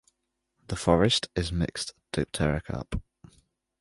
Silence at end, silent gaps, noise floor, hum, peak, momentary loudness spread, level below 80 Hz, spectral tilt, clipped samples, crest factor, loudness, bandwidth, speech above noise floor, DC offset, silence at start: 0.8 s; none; -79 dBFS; none; -6 dBFS; 14 LU; -42 dBFS; -5 dB/octave; under 0.1%; 22 dB; -28 LUFS; 11.5 kHz; 52 dB; under 0.1%; 0.7 s